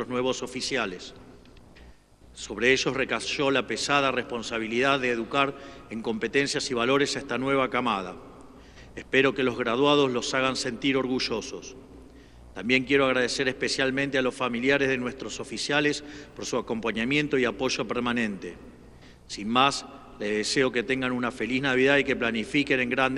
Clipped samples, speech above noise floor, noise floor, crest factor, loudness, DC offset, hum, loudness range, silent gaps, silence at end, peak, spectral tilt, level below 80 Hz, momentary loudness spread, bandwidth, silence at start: under 0.1%; 26 dB; -52 dBFS; 22 dB; -26 LUFS; under 0.1%; none; 3 LU; none; 0 s; -6 dBFS; -3.5 dB/octave; -54 dBFS; 13 LU; 12 kHz; 0 s